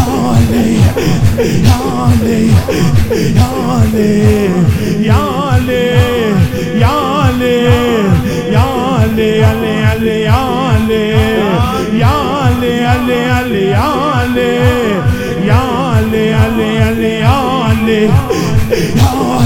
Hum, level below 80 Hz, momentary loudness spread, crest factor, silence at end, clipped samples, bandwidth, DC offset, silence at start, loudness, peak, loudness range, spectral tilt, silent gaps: none; -26 dBFS; 2 LU; 10 dB; 0 s; 0.7%; 17 kHz; 0.2%; 0 s; -11 LUFS; 0 dBFS; 1 LU; -6.5 dB/octave; none